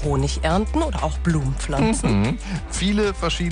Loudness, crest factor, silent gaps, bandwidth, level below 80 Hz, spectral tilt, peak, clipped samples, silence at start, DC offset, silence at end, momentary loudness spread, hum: -22 LUFS; 14 dB; none; 10 kHz; -28 dBFS; -5.5 dB/octave; -8 dBFS; under 0.1%; 0 s; under 0.1%; 0 s; 4 LU; none